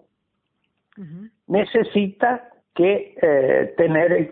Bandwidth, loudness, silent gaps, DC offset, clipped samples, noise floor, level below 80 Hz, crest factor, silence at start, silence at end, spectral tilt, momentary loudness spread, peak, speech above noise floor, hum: 4.2 kHz; -19 LUFS; none; under 0.1%; under 0.1%; -74 dBFS; -62 dBFS; 16 dB; 1 s; 0 s; -11.5 dB/octave; 20 LU; -4 dBFS; 55 dB; none